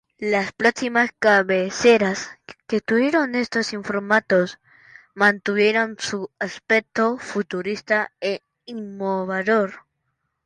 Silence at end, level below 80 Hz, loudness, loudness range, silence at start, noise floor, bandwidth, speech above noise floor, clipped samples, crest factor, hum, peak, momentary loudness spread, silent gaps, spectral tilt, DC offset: 0.65 s; -64 dBFS; -21 LUFS; 5 LU; 0.2 s; -75 dBFS; 11 kHz; 54 dB; under 0.1%; 18 dB; none; -4 dBFS; 11 LU; none; -4.5 dB/octave; under 0.1%